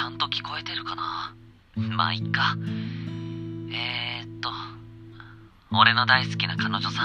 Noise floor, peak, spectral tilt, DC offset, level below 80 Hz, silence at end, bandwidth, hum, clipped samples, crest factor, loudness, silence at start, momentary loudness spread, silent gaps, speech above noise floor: -48 dBFS; -2 dBFS; -5 dB/octave; under 0.1%; -58 dBFS; 0 s; 8.8 kHz; none; under 0.1%; 26 dB; -25 LUFS; 0 s; 19 LU; none; 24 dB